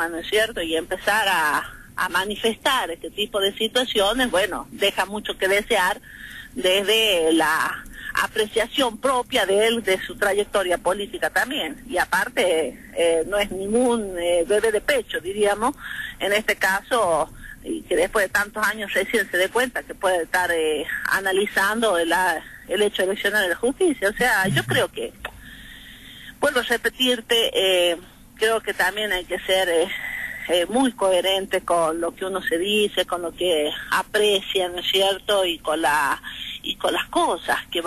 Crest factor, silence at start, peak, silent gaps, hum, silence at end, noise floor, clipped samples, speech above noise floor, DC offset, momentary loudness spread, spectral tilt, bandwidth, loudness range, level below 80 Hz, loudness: 14 dB; 0 s; -8 dBFS; none; none; 0 s; -42 dBFS; under 0.1%; 20 dB; under 0.1%; 8 LU; -2.5 dB/octave; 13.5 kHz; 2 LU; -48 dBFS; -21 LUFS